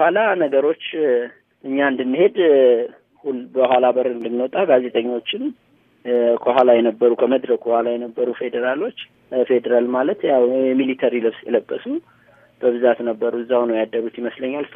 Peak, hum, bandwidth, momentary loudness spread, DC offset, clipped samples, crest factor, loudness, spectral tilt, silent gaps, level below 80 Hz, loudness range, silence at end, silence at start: 0 dBFS; none; 3.8 kHz; 11 LU; under 0.1%; under 0.1%; 18 dB; -19 LUFS; -8 dB/octave; none; -74 dBFS; 3 LU; 0.1 s; 0 s